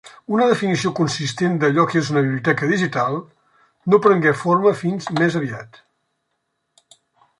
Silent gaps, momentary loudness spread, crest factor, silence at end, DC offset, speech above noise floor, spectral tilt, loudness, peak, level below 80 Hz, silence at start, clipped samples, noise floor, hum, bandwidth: none; 8 LU; 18 dB; 1.75 s; under 0.1%; 55 dB; -6 dB/octave; -19 LUFS; -2 dBFS; -62 dBFS; 0.05 s; under 0.1%; -73 dBFS; none; 11.5 kHz